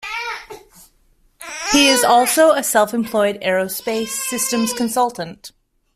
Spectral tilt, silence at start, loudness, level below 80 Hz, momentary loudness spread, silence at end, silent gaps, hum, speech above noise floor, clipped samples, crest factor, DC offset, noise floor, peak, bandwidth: -2 dB/octave; 0 s; -17 LUFS; -54 dBFS; 17 LU; 0.45 s; none; none; 40 dB; under 0.1%; 16 dB; under 0.1%; -57 dBFS; -2 dBFS; 16 kHz